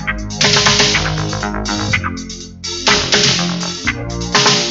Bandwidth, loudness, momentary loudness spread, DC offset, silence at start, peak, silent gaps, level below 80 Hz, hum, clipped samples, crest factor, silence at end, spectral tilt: 8.2 kHz; -14 LUFS; 13 LU; under 0.1%; 0 s; 0 dBFS; none; -32 dBFS; none; under 0.1%; 16 dB; 0 s; -2.5 dB/octave